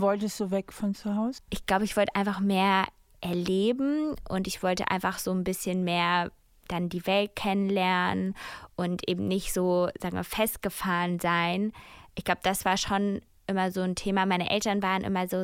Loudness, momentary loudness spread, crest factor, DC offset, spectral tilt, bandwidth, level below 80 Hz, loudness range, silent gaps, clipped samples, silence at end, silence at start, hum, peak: -28 LUFS; 8 LU; 18 dB; under 0.1%; -5 dB/octave; 16.5 kHz; -52 dBFS; 1 LU; none; under 0.1%; 0 s; 0 s; none; -10 dBFS